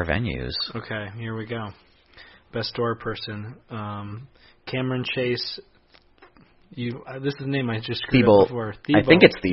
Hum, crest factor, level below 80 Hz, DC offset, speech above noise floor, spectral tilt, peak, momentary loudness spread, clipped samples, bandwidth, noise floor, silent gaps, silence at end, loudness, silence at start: none; 24 dB; -46 dBFS; under 0.1%; 34 dB; -9.5 dB/octave; 0 dBFS; 19 LU; under 0.1%; 6 kHz; -57 dBFS; none; 0 s; -23 LUFS; 0 s